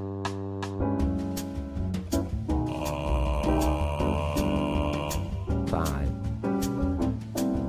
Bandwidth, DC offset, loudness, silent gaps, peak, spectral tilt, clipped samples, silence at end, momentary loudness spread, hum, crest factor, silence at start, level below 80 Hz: 16 kHz; under 0.1%; -29 LUFS; none; -12 dBFS; -6.5 dB/octave; under 0.1%; 0 s; 6 LU; none; 16 dB; 0 s; -34 dBFS